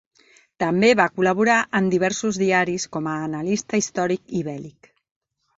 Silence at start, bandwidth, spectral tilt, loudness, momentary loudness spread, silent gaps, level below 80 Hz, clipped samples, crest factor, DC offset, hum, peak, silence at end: 0.6 s; 8 kHz; -4.5 dB/octave; -21 LUFS; 10 LU; none; -60 dBFS; under 0.1%; 20 dB; under 0.1%; none; -2 dBFS; 0.9 s